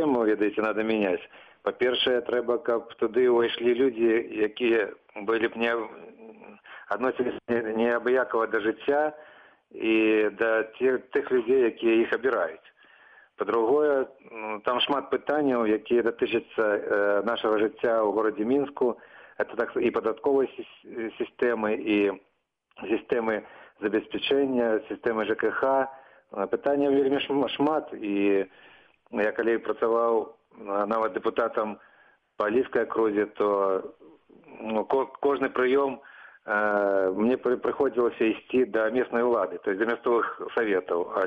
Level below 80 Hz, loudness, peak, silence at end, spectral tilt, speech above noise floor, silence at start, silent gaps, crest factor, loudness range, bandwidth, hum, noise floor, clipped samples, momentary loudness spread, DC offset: -66 dBFS; -26 LUFS; -12 dBFS; 0 s; -7 dB/octave; 41 dB; 0 s; none; 14 dB; 3 LU; 5.2 kHz; none; -67 dBFS; under 0.1%; 9 LU; under 0.1%